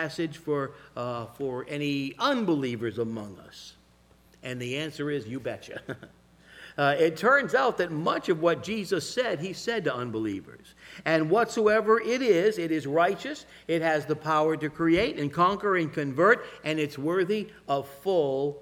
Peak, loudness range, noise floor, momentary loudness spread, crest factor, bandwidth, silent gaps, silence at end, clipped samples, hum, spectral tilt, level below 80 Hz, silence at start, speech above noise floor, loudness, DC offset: -6 dBFS; 7 LU; -60 dBFS; 14 LU; 22 dB; 16.5 kHz; none; 0 s; under 0.1%; none; -5.5 dB/octave; -62 dBFS; 0 s; 32 dB; -27 LUFS; under 0.1%